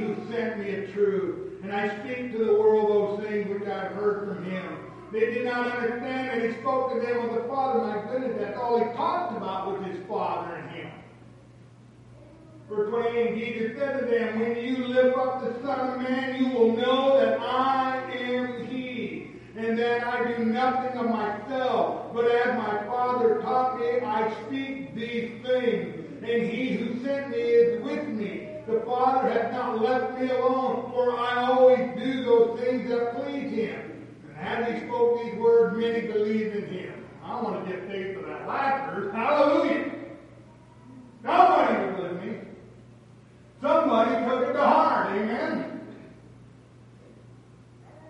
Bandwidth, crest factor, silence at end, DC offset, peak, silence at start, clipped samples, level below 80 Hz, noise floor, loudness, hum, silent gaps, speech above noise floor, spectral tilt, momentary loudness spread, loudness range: 8.4 kHz; 22 dB; 0 s; under 0.1%; -4 dBFS; 0 s; under 0.1%; -64 dBFS; -51 dBFS; -26 LUFS; none; none; 26 dB; -7 dB/octave; 13 LU; 5 LU